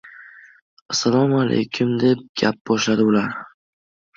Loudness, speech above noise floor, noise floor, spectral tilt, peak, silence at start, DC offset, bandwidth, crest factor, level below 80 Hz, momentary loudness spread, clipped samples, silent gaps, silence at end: -19 LUFS; 26 dB; -44 dBFS; -5 dB/octave; -4 dBFS; 0.05 s; under 0.1%; 7.8 kHz; 18 dB; -60 dBFS; 6 LU; under 0.1%; 0.62-0.89 s, 2.29-2.35 s, 2.61-2.65 s; 0.7 s